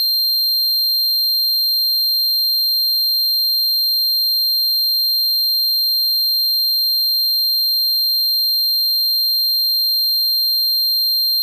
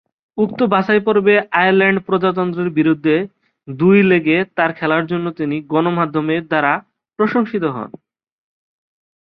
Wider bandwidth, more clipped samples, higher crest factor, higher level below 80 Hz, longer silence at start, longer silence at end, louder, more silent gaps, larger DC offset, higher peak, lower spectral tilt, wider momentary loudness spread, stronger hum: first, 16.5 kHz vs 5.4 kHz; neither; second, 2 dB vs 16 dB; second, under -90 dBFS vs -60 dBFS; second, 0 s vs 0.35 s; second, 0 s vs 1.35 s; first, -13 LUFS vs -16 LUFS; neither; neither; second, -14 dBFS vs -2 dBFS; second, 9.5 dB/octave vs -9.5 dB/octave; second, 0 LU vs 9 LU; neither